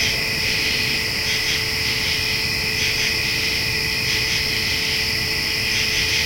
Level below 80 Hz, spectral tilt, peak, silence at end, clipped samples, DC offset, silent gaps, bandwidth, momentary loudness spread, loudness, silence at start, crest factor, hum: -40 dBFS; -1.5 dB/octave; -6 dBFS; 0 s; under 0.1%; under 0.1%; none; 16.5 kHz; 1 LU; -18 LUFS; 0 s; 14 dB; none